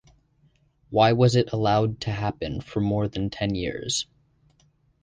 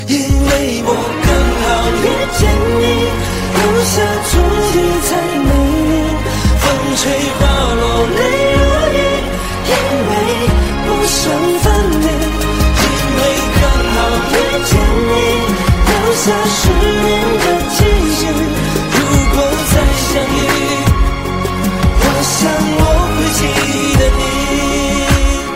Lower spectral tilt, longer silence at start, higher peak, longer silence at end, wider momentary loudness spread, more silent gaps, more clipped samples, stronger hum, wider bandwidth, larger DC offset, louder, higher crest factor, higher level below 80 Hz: about the same, -5.5 dB/octave vs -4.5 dB/octave; first, 0.9 s vs 0 s; second, -4 dBFS vs 0 dBFS; first, 1 s vs 0 s; first, 9 LU vs 3 LU; neither; neither; neither; second, 10 kHz vs 16.5 kHz; second, under 0.1% vs 0.7%; second, -24 LUFS vs -13 LUFS; first, 20 dB vs 12 dB; second, -48 dBFS vs -18 dBFS